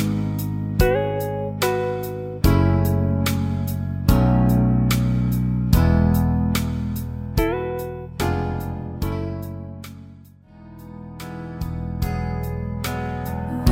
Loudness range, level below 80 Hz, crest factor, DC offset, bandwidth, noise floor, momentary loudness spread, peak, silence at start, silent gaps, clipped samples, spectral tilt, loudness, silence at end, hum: 12 LU; -30 dBFS; 20 dB; under 0.1%; 16.5 kHz; -45 dBFS; 15 LU; -2 dBFS; 0 s; none; under 0.1%; -7 dB/octave; -22 LUFS; 0 s; none